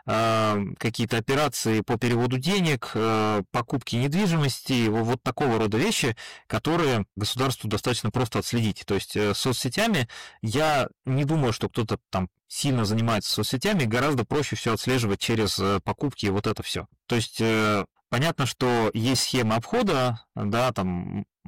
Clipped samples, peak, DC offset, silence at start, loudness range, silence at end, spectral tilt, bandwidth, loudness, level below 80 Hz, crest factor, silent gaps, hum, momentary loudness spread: under 0.1%; -16 dBFS; 0.2%; 0.05 s; 2 LU; 0.25 s; -5 dB/octave; 17 kHz; -25 LUFS; -52 dBFS; 10 dB; none; none; 6 LU